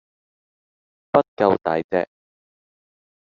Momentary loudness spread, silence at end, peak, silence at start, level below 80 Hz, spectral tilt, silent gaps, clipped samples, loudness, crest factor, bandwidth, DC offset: 6 LU; 1.15 s; -2 dBFS; 1.15 s; -64 dBFS; -5 dB/octave; 1.28-1.37 s, 1.84-1.89 s; under 0.1%; -21 LUFS; 22 dB; 6.8 kHz; under 0.1%